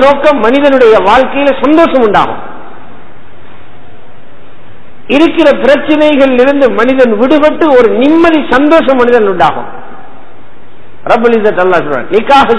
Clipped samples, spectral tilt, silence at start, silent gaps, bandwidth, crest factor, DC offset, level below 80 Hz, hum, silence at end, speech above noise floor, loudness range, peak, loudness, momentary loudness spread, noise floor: 5%; -6 dB/octave; 0 s; none; 11 kHz; 8 dB; 10%; -36 dBFS; none; 0 s; 31 dB; 7 LU; 0 dBFS; -7 LUFS; 6 LU; -38 dBFS